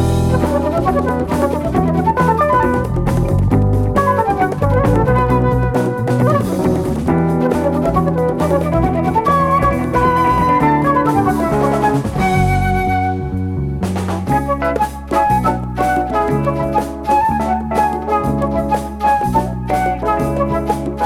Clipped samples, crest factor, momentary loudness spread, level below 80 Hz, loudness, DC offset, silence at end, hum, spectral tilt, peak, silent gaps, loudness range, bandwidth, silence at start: under 0.1%; 14 dB; 5 LU; -28 dBFS; -16 LUFS; under 0.1%; 0 s; none; -7.5 dB/octave; 0 dBFS; none; 3 LU; 16.5 kHz; 0 s